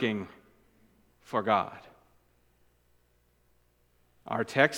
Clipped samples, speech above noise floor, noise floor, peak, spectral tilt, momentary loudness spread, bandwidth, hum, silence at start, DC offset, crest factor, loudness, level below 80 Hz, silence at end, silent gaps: under 0.1%; 40 dB; -69 dBFS; -6 dBFS; -5 dB/octave; 22 LU; 19.5 kHz; none; 0 s; under 0.1%; 28 dB; -30 LUFS; -70 dBFS; 0 s; none